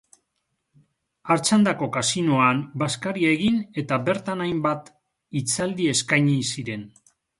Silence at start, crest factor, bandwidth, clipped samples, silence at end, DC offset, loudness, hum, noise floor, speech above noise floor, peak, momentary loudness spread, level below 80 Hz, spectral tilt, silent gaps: 1.25 s; 20 dB; 11.5 kHz; under 0.1%; 0.5 s; under 0.1%; -23 LUFS; none; -76 dBFS; 54 dB; -4 dBFS; 10 LU; -60 dBFS; -4.5 dB/octave; none